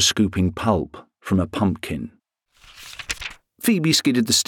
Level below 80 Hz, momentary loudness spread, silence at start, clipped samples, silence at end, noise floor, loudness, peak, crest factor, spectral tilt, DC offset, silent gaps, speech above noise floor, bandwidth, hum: -46 dBFS; 19 LU; 0 s; under 0.1%; 0.05 s; -58 dBFS; -21 LUFS; -6 dBFS; 16 dB; -3.5 dB/octave; under 0.1%; none; 38 dB; 19 kHz; none